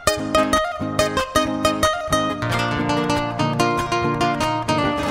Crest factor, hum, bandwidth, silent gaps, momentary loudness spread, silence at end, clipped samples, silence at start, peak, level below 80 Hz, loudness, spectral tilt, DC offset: 20 dB; none; 16 kHz; none; 3 LU; 0 s; under 0.1%; 0 s; 0 dBFS; -40 dBFS; -20 LUFS; -4.5 dB/octave; under 0.1%